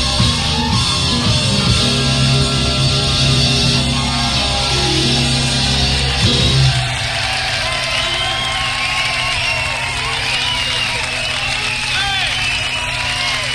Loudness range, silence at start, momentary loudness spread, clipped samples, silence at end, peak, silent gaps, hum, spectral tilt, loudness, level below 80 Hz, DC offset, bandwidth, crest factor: 3 LU; 0 s; 4 LU; under 0.1%; 0 s; 0 dBFS; none; none; -3.5 dB/octave; -14 LUFS; -28 dBFS; under 0.1%; 13.5 kHz; 16 dB